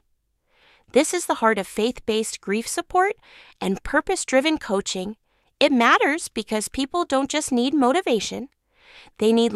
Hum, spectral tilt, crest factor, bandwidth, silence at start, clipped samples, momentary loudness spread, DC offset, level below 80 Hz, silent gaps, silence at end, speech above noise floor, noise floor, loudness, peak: none; -3 dB/octave; 20 dB; 14.5 kHz; 0.95 s; under 0.1%; 9 LU; under 0.1%; -50 dBFS; none; 0 s; 47 dB; -69 dBFS; -22 LUFS; -4 dBFS